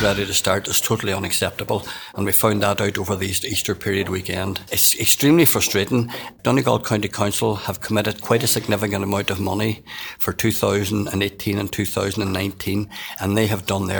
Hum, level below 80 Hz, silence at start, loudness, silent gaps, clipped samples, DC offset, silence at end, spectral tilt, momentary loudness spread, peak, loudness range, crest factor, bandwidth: none; -48 dBFS; 0 s; -20 LUFS; none; under 0.1%; under 0.1%; 0 s; -4 dB/octave; 10 LU; 0 dBFS; 5 LU; 20 dB; over 20 kHz